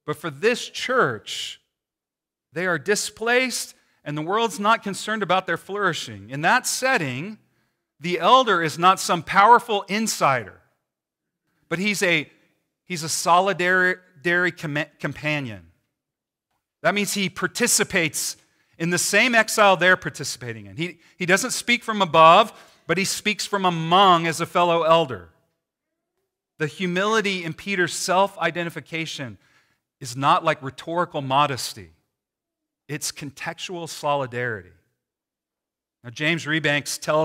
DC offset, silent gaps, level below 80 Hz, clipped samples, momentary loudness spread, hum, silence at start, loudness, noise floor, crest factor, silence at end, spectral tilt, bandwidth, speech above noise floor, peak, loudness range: under 0.1%; none; -66 dBFS; under 0.1%; 15 LU; none; 0.05 s; -21 LUFS; -88 dBFS; 20 dB; 0 s; -3 dB/octave; 16 kHz; 67 dB; -2 dBFS; 8 LU